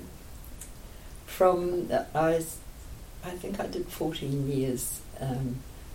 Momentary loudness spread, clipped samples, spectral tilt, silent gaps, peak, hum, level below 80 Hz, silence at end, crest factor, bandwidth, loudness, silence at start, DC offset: 21 LU; under 0.1%; -5.5 dB/octave; none; -10 dBFS; none; -46 dBFS; 0 s; 20 dB; 16.5 kHz; -30 LUFS; 0 s; under 0.1%